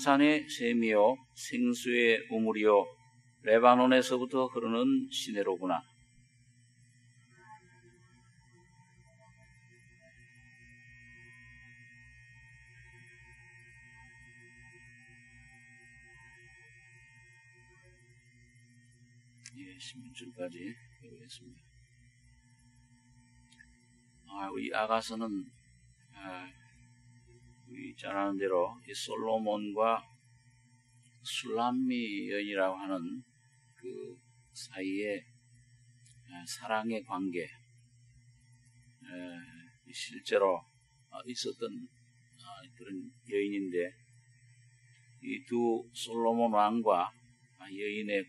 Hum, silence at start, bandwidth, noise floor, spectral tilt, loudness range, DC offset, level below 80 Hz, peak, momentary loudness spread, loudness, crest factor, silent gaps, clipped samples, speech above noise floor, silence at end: none; 0 s; 11.5 kHz; -66 dBFS; -4.5 dB/octave; 27 LU; under 0.1%; -74 dBFS; -8 dBFS; 27 LU; -32 LUFS; 28 dB; none; under 0.1%; 34 dB; 0.05 s